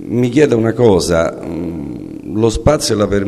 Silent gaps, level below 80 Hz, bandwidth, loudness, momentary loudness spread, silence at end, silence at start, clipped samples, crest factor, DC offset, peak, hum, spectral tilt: none; -32 dBFS; 13 kHz; -14 LUFS; 12 LU; 0 s; 0 s; under 0.1%; 14 dB; 0.1%; 0 dBFS; none; -6 dB/octave